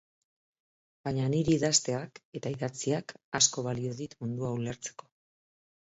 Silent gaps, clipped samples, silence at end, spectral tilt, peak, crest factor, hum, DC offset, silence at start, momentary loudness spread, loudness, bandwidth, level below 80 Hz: 2.25-2.32 s, 3.24-3.32 s; under 0.1%; 0.95 s; -4 dB/octave; -8 dBFS; 24 dB; none; under 0.1%; 1.05 s; 14 LU; -30 LUFS; 8.2 kHz; -62 dBFS